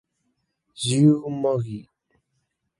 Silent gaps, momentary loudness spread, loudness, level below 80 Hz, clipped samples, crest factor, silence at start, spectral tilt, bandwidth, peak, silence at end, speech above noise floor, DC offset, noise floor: none; 15 LU; -22 LUFS; -62 dBFS; under 0.1%; 20 dB; 0.8 s; -6.5 dB/octave; 11.5 kHz; -6 dBFS; 1 s; 54 dB; under 0.1%; -75 dBFS